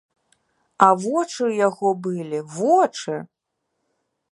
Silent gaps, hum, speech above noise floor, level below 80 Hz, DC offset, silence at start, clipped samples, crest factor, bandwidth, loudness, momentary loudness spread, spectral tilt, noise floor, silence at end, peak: none; none; 56 dB; -74 dBFS; under 0.1%; 0.8 s; under 0.1%; 22 dB; 11.5 kHz; -21 LUFS; 12 LU; -5.5 dB/octave; -76 dBFS; 1.05 s; 0 dBFS